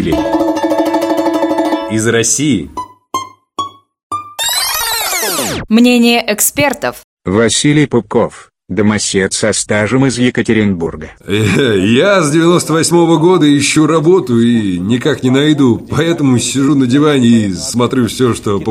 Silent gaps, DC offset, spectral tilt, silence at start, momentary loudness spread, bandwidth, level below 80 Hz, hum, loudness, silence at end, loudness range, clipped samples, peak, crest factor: 4.03-4.10 s, 7.04-7.17 s; under 0.1%; -4.5 dB/octave; 0 s; 12 LU; 16.5 kHz; -42 dBFS; none; -11 LUFS; 0 s; 5 LU; under 0.1%; 0 dBFS; 12 dB